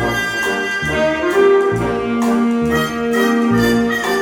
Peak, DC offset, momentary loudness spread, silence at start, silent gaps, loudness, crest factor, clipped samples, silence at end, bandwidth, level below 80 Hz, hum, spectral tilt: -2 dBFS; under 0.1%; 5 LU; 0 s; none; -16 LUFS; 12 dB; under 0.1%; 0 s; 18.5 kHz; -38 dBFS; none; -5 dB/octave